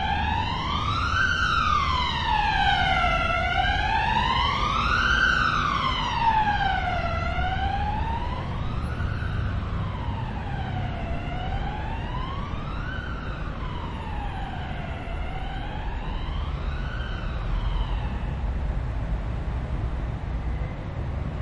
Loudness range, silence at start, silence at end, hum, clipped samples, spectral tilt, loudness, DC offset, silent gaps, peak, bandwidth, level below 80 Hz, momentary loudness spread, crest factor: 10 LU; 0 s; 0 s; none; under 0.1%; -5.5 dB/octave; -26 LUFS; under 0.1%; none; -10 dBFS; 9.6 kHz; -32 dBFS; 11 LU; 16 dB